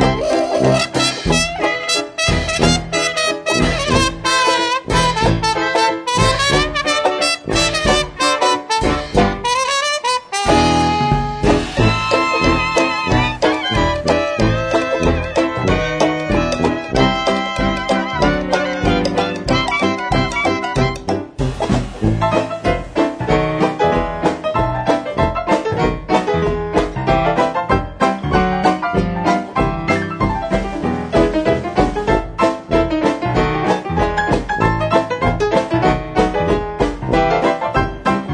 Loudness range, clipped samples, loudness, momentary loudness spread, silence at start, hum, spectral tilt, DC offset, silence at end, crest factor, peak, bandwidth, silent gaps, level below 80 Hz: 3 LU; under 0.1%; -16 LUFS; 4 LU; 0 s; none; -4.5 dB/octave; under 0.1%; 0 s; 16 dB; 0 dBFS; 11 kHz; none; -30 dBFS